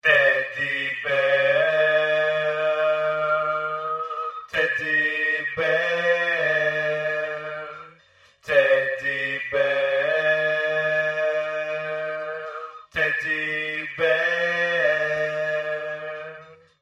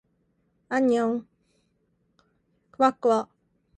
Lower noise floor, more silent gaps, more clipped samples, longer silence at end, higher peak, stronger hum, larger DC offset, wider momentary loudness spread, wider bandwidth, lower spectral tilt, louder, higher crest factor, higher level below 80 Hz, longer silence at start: second, -56 dBFS vs -71 dBFS; neither; neither; second, 0.3 s vs 0.55 s; about the same, -6 dBFS vs -6 dBFS; neither; neither; about the same, 11 LU vs 9 LU; about the same, 8.6 kHz vs 9.4 kHz; second, -4 dB/octave vs -5.5 dB/octave; first, -22 LUFS vs -25 LUFS; about the same, 18 dB vs 22 dB; first, -66 dBFS vs -72 dBFS; second, 0.05 s vs 0.7 s